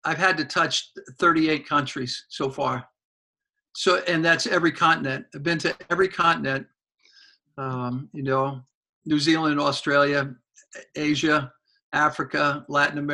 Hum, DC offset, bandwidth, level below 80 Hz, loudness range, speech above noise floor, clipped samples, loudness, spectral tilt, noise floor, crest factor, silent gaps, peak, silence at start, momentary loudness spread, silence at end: none; under 0.1%; 11.5 kHz; -62 dBFS; 4 LU; 33 dB; under 0.1%; -23 LUFS; -4.5 dB/octave; -57 dBFS; 20 dB; 3.04-3.34 s, 3.49-3.53 s, 8.75-8.83 s, 8.89-9.02 s, 11.83-11.92 s; -6 dBFS; 0.05 s; 11 LU; 0 s